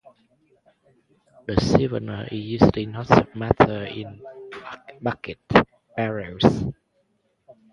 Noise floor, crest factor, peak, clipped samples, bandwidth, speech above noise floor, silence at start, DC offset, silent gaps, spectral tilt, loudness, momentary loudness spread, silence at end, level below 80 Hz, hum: -68 dBFS; 24 dB; 0 dBFS; under 0.1%; 10.5 kHz; 47 dB; 1.5 s; under 0.1%; none; -7 dB/octave; -22 LUFS; 19 LU; 0.2 s; -44 dBFS; none